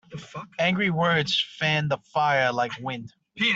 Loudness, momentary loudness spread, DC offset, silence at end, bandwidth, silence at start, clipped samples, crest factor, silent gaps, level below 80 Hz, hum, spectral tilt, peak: -24 LUFS; 16 LU; under 0.1%; 0 s; 8 kHz; 0.1 s; under 0.1%; 18 dB; none; -64 dBFS; none; -5 dB/octave; -8 dBFS